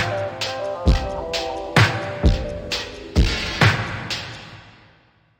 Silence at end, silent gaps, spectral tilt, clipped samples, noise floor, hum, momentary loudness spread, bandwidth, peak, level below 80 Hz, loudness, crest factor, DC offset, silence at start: 0.7 s; none; -5 dB/octave; under 0.1%; -56 dBFS; none; 10 LU; 16.5 kHz; 0 dBFS; -28 dBFS; -21 LUFS; 20 dB; under 0.1%; 0 s